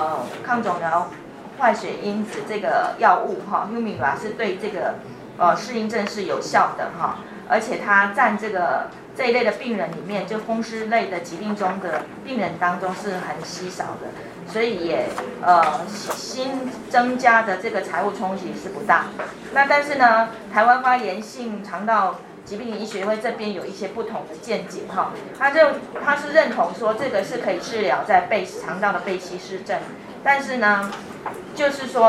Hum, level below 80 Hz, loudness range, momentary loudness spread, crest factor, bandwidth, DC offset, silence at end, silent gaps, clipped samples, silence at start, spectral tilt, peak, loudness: none; -62 dBFS; 6 LU; 13 LU; 20 dB; 14.5 kHz; under 0.1%; 0 s; none; under 0.1%; 0 s; -4.5 dB/octave; -2 dBFS; -22 LUFS